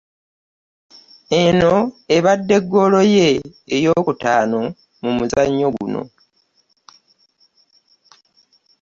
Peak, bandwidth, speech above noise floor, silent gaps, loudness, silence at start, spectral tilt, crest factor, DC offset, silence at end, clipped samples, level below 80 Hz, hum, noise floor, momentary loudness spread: -2 dBFS; 7.6 kHz; 47 dB; none; -16 LUFS; 1.3 s; -5.5 dB/octave; 16 dB; under 0.1%; 2.75 s; under 0.1%; -50 dBFS; none; -62 dBFS; 11 LU